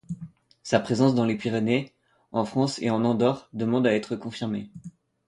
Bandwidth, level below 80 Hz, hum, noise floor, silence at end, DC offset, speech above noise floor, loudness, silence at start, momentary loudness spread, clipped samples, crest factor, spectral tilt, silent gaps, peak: 11 kHz; -64 dBFS; none; -45 dBFS; 0.4 s; under 0.1%; 21 dB; -25 LUFS; 0.1 s; 18 LU; under 0.1%; 20 dB; -6.5 dB/octave; none; -6 dBFS